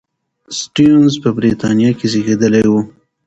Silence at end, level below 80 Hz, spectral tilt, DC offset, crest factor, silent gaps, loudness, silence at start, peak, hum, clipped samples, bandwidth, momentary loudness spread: 0.35 s; -46 dBFS; -6 dB/octave; under 0.1%; 12 dB; none; -13 LUFS; 0.5 s; 0 dBFS; none; under 0.1%; 8.2 kHz; 11 LU